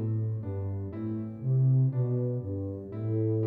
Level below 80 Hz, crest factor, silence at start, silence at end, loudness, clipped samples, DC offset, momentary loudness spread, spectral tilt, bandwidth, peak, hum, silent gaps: -66 dBFS; 10 dB; 0 s; 0 s; -30 LUFS; under 0.1%; under 0.1%; 10 LU; -13.5 dB/octave; 2.4 kHz; -18 dBFS; none; none